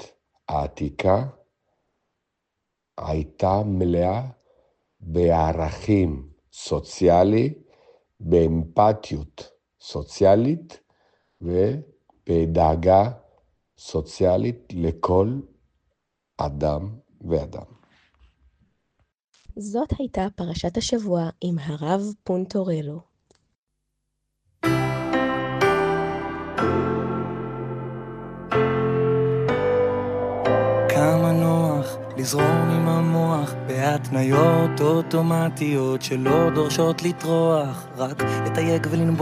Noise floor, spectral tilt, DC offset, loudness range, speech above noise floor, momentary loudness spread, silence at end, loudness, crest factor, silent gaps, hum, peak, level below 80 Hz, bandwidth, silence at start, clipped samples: -80 dBFS; -6.5 dB/octave; under 0.1%; 8 LU; 59 dB; 14 LU; 0 s; -22 LUFS; 18 dB; 19.24-19.28 s, 23.58-23.67 s; none; -4 dBFS; -46 dBFS; 15.5 kHz; 0 s; under 0.1%